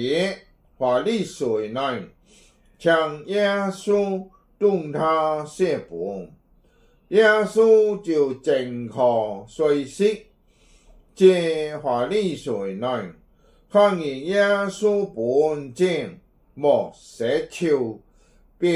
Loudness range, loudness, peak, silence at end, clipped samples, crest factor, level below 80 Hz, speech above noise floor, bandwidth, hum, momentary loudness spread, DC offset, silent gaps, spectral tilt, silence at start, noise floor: 4 LU; -22 LUFS; -4 dBFS; 0 s; under 0.1%; 18 dB; -58 dBFS; 36 dB; 11.5 kHz; none; 12 LU; under 0.1%; none; -5.5 dB/octave; 0 s; -58 dBFS